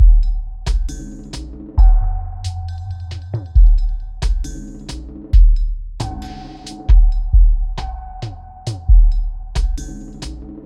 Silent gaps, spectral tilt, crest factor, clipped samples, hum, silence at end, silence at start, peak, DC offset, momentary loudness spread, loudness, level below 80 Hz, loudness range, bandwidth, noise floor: none; -6 dB/octave; 14 dB; under 0.1%; none; 0.05 s; 0 s; 0 dBFS; under 0.1%; 17 LU; -19 LUFS; -14 dBFS; 3 LU; 8 kHz; -33 dBFS